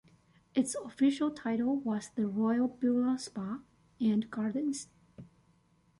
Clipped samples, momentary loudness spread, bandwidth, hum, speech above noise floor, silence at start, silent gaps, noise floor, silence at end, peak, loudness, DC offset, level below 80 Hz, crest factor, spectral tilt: under 0.1%; 10 LU; 11.5 kHz; none; 37 dB; 0.55 s; none; -68 dBFS; 0.75 s; -18 dBFS; -32 LUFS; under 0.1%; -72 dBFS; 16 dB; -5.5 dB/octave